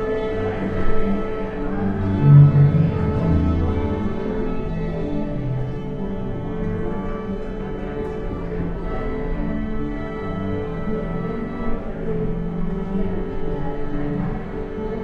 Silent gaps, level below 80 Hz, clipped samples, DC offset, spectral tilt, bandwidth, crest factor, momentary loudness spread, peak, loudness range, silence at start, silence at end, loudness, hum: none; -28 dBFS; under 0.1%; under 0.1%; -10.5 dB/octave; 4.6 kHz; 18 dB; 9 LU; -2 dBFS; 10 LU; 0 s; 0 s; -23 LUFS; none